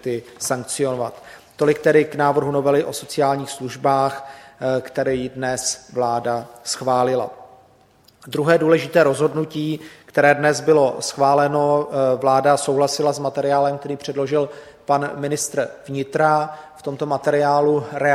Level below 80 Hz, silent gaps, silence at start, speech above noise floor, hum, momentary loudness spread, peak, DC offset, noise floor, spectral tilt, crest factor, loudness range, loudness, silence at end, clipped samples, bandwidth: -60 dBFS; none; 0.05 s; 35 dB; none; 11 LU; 0 dBFS; under 0.1%; -54 dBFS; -4.5 dB/octave; 20 dB; 5 LU; -20 LUFS; 0 s; under 0.1%; 15.5 kHz